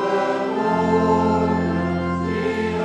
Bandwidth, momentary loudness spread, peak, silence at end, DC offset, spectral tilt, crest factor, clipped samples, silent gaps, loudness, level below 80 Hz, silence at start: 9.2 kHz; 5 LU; -6 dBFS; 0 s; under 0.1%; -7.5 dB/octave; 12 dB; under 0.1%; none; -20 LUFS; -44 dBFS; 0 s